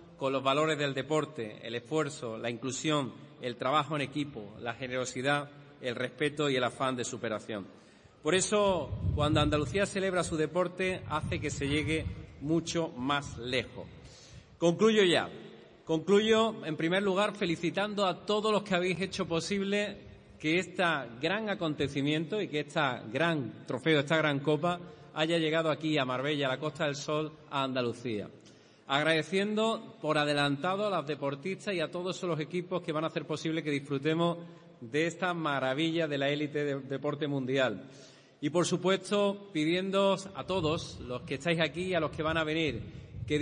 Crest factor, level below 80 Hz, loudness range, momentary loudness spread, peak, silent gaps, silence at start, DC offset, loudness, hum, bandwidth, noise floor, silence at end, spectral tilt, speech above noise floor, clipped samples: 20 dB; -56 dBFS; 4 LU; 10 LU; -12 dBFS; none; 0 s; under 0.1%; -31 LUFS; none; 10.5 kHz; -57 dBFS; 0 s; -5 dB/octave; 26 dB; under 0.1%